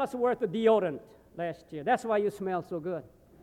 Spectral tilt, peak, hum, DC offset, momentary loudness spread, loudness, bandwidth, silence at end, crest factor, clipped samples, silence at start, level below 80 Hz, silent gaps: -6.5 dB/octave; -12 dBFS; none; under 0.1%; 13 LU; -30 LUFS; 14 kHz; 0.35 s; 18 dB; under 0.1%; 0 s; -66 dBFS; none